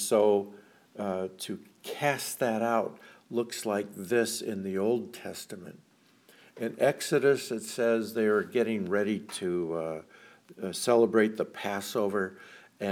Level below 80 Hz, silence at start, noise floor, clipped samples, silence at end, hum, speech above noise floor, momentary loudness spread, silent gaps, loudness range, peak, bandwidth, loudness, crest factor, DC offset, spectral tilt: -80 dBFS; 0 s; -61 dBFS; under 0.1%; 0 s; none; 32 dB; 15 LU; none; 4 LU; -10 dBFS; 18 kHz; -30 LUFS; 20 dB; under 0.1%; -4.5 dB/octave